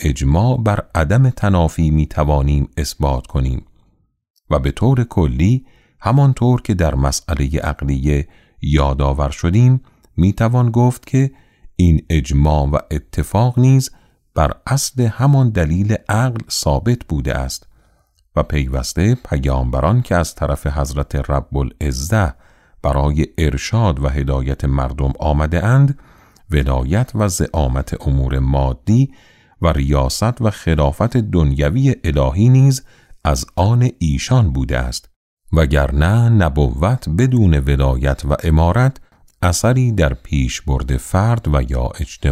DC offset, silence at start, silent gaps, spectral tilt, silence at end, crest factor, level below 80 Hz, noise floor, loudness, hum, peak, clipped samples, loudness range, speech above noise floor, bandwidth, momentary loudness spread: under 0.1%; 0 s; 4.30-4.34 s, 35.16-35.37 s; -6.5 dB/octave; 0 s; 14 dB; -24 dBFS; -58 dBFS; -17 LUFS; none; -2 dBFS; under 0.1%; 3 LU; 43 dB; 14.5 kHz; 7 LU